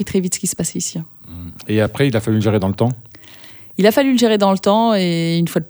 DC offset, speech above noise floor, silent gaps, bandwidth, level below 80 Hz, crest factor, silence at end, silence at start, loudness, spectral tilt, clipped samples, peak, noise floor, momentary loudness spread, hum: under 0.1%; 24 dB; none; over 20 kHz; -50 dBFS; 16 dB; 0.05 s; 0 s; -16 LUFS; -5 dB/octave; under 0.1%; 0 dBFS; -40 dBFS; 19 LU; none